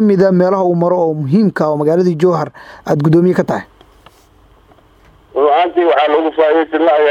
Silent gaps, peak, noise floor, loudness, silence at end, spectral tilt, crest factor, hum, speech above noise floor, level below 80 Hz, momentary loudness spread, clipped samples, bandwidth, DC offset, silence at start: none; 0 dBFS; -47 dBFS; -13 LUFS; 0 s; -8 dB/octave; 12 dB; none; 35 dB; -54 dBFS; 8 LU; under 0.1%; 9 kHz; under 0.1%; 0 s